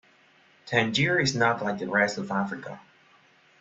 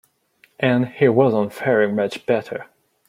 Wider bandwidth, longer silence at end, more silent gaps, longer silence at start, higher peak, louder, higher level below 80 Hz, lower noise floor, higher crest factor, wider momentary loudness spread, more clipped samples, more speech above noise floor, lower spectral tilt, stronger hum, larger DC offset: second, 8.2 kHz vs 15 kHz; first, 0.8 s vs 0.45 s; neither; about the same, 0.65 s vs 0.6 s; second, -8 dBFS vs -2 dBFS; second, -25 LUFS vs -19 LUFS; about the same, -64 dBFS vs -64 dBFS; about the same, -60 dBFS vs -58 dBFS; about the same, 20 dB vs 18 dB; first, 14 LU vs 7 LU; neither; second, 34 dB vs 40 dB; second, -4.5 dB/octave vs -7.5 dB/octave; neither; neither